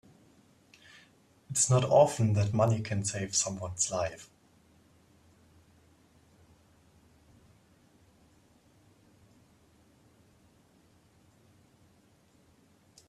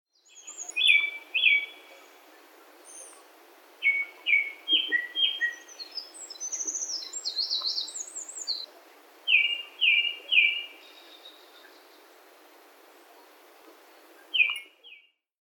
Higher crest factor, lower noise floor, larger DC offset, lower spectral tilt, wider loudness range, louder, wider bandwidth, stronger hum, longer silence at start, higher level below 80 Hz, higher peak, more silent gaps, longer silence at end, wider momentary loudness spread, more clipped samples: about the same, 24 dB vs 24 dB; first, -64 dBFS vs -56 dBFS; neither; first, -4.5 dB/octave vs 6.5 dB/octave; first, 11 LU vs 7 LU; second, -28 LUFS vs -25 LUFS; second, 13 kHz vs 18 kHz; neither; first, 1.5 s vs 0.35 s; first, -66 dBFS vs under -90 dBFS; about the same, -10 dBFS vs -8 dBFS; neither; first, 8.85 s vs 0.6 s; second, 11 LU vs 20 LU; neither